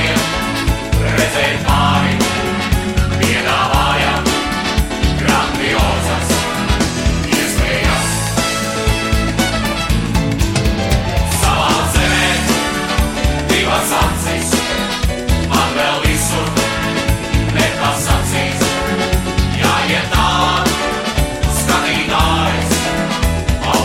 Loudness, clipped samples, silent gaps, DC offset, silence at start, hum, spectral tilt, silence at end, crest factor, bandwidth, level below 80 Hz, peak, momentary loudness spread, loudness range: -15 LUFS; under 0.1%; none; 0.2%; 0 s; none; -4 dB/octave; 0 s; 14 dB; 16.5 kHz; -22 dBFS; 0 dBFS; 4 LU; 1 LU